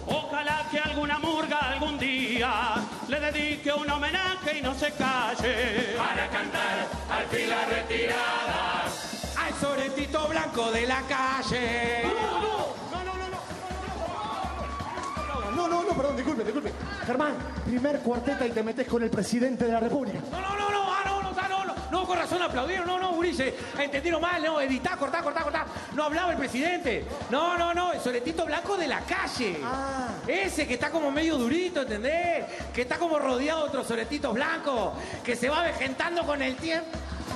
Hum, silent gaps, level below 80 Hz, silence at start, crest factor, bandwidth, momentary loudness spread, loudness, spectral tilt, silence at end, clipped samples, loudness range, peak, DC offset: none; none; -46 dBFS; 0 s; 16 dB; 13 kHz; 6 LU; -28 LUFS; -4 dB/octave; 0 s; under 0.1%; 2 LU; -12 dBFS; under 0.1%